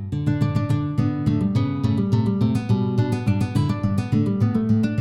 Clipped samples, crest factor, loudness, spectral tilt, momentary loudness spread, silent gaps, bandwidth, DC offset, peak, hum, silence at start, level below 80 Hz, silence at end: under 0.1%; 12 dB; -22 LUFS; -8.5 dB/octave; 2 LU; none; 11.5 kHz; under 0.1%; -8 dBFS; none; 0 s; -44 dBFS; 0 s